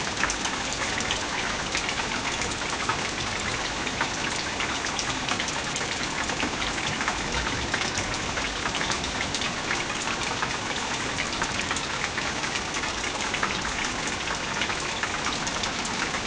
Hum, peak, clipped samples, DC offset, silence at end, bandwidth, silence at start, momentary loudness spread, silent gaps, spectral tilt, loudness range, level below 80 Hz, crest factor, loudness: none; -8 dBFS; under 0.1%; under 0.1%; 0 s; 10.5 kHz; 0 s; 1 LU; none; -2 dB/octave; 0 LU; -44 dBFS; 20 dB; -27 LUFS